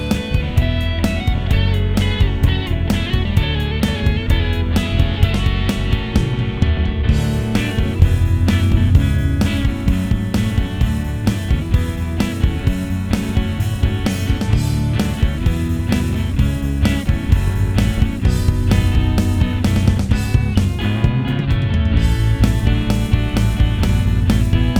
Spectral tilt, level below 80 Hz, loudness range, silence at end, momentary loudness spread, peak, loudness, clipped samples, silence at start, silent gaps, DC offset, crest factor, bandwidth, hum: -6.5 dB/octave; -20 dBFS; 2 LU; 0 s; 4 LU; 0 dBFS; -18 LUFS; under 0.1%; 0 s; none; 0.5%; 16 dB; 16.5 kHz; none